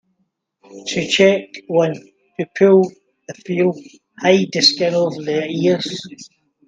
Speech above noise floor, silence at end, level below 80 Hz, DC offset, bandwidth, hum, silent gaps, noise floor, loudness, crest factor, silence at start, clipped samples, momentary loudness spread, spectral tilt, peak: 52 dB; 0.4 s; -64 dBFS; under 0.1%; 9.2 kHz; none; none; -69 dBFS; -17 LUFS; 18 dB; 0.7 s; under 0.1%; 20 LU; -4.5 dB/octave; 0 dBFS